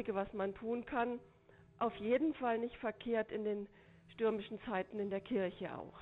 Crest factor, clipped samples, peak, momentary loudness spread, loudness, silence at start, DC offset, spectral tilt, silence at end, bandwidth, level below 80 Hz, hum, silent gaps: 16 dB; under 0.1%; -24 dBFS; 9 LU; -39 LUFS; 0 s; under 0.1%; -8.5 dB/octave; 0 s; 4.1 kHz; -68 dBFS; none; none